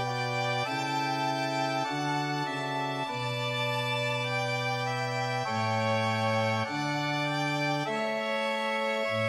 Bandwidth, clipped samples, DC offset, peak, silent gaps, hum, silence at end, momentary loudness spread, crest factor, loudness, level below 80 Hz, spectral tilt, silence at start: 15.5 kHz; under 0.1%; under 0.1%; -16 dBFS; none; none; 0 s; 3 LU; 14 dB; -29 LUFS; -72 dBFS; -5 dB/octave; 0 s